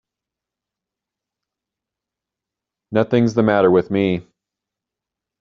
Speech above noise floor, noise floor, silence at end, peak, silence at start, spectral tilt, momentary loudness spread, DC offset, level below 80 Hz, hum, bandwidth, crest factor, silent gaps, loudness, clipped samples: 70 dB; -86 dBFS; 1.2 s; -2 dBFS; 2.9 s; -6.5 dB/octave; 8 LU; under 0.1%; -58 dBFS; none; 7.2 kHz; 20 dB; none; -17 LUFS; under 0.1%